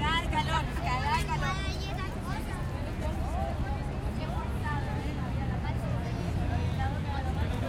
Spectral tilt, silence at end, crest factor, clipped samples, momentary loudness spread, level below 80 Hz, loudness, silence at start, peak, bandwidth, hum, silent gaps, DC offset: -6 dB/octave; 0 s; 16 dB; under 0.1%; 6 LU; -36 dBFS; -32 LUFS; 0 s; -14 dBFS; 15.5 kHz; none; none; under 0.1%